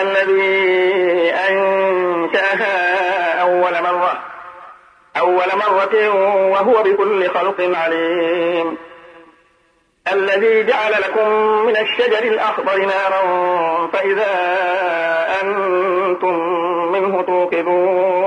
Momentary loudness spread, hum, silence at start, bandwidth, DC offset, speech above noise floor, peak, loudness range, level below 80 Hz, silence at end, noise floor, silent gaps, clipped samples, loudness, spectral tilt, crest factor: 4 LU; none; 0 s; 9.8 kHz; under 0.1%; 43 dB; -4 dBFS; 3 LU; -68 dBFS; 0 s; -58 dBFS; none; under 0.1%; -16 LUFS; -5 dB/octave; 12 dB